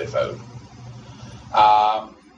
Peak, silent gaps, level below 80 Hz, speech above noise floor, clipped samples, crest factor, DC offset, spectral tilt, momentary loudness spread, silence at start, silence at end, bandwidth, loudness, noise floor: -4 dBFS; none; -52 dBFS; 21 dB; under 0.1%; 18 dB; under 0.1%; -5 dB/octave; 26 LU; 0 s; 0.3 s; 7.8 kHz; -19 LUFS; -40 dBFS